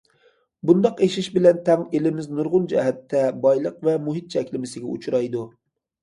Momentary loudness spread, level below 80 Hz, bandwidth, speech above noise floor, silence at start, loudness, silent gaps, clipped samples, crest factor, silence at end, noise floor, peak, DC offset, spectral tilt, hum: 12 LU; -66 dBFS; 11.5 kHz; 40 dB; 0.65 s; -22 LUFS; none; under 0.1%; 18 dB; 0.55 s; -61 dBFS; -2 dBFS; under 0.1%; -7 dB/octave; none